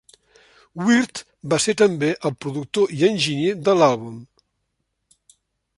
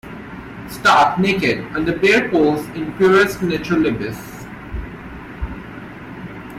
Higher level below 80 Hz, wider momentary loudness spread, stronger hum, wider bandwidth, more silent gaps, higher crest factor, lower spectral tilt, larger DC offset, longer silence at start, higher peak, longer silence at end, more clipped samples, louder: second, -62 dBFS vs -38 dBFS; second, 14 LU vs 20 LU; neither; second, 11.5 kHz vs 15.5 kHz; neither; about the same, 18 dB vs 16 dB; about the same, -4.5 dB/octave vs -5.5 dB/octave; neither; first, 0.75 s vs 0.05 s; about the same, -4 dBFS vs -2 dBFS; first, 1.55 s vs 0 s; neither; second, -20 LUFS vs -16 LUFS